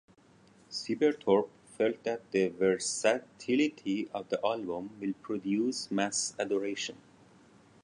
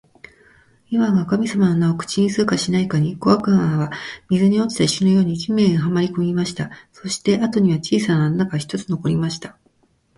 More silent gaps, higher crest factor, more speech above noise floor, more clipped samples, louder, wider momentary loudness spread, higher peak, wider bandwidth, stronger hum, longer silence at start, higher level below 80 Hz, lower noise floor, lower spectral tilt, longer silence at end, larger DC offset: neither; about the same, 20 dB vs 16 dB; second, 30 dB vs 43 dB; neither; second, -32 LUFS vs -19 LUFS; about the same, 9 LU vs 9 LU; second, -12 dBFS vs -2 dBFS; about the same, 11.5 kHz vs 11.5 kHz; neither; second, 0.7 s vs 0.9 s; second, -74 dBFS vs -52 dBFS; about the same, -61 dBFS vs -61 dBFS; second, -3.5 dB/octave vs -6 dB/octave; first, 0.9 s vs 0.65 s; neither